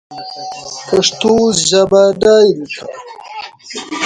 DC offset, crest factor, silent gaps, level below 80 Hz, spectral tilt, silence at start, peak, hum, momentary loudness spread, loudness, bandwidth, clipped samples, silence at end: under 0.1%; 14 dB; none; -50 dBFS; -3.5 dB/octave; 0.1 s; 0 dBFS; none; 19 LU; -11 LUFS; 10.5 kHz; under 0.1%; 0 s